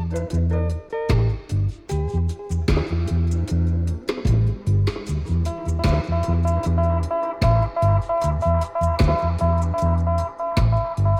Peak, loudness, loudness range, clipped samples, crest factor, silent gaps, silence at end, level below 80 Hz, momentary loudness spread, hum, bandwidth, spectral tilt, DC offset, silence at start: -6 dBFS; -22 LUFS; 2 LU; under 0.1%; 16 dB; none; 0 s; -26 dBFS; 5 LU; none; 10.5 kHz; -8 dB/octave; under 0.1%; 0 s